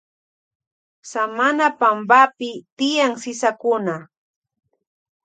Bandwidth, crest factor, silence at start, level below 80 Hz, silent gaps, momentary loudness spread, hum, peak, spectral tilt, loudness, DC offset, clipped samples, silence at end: 9.4 kHz; 20 dB; 1.05 s; -78 dBFS; 2.72-2.77 s; 16 LU; none; 0 dBFS; -3.5 dB/octave; -18 LUFS; under 0.1%; under 0.1%; 1.2 s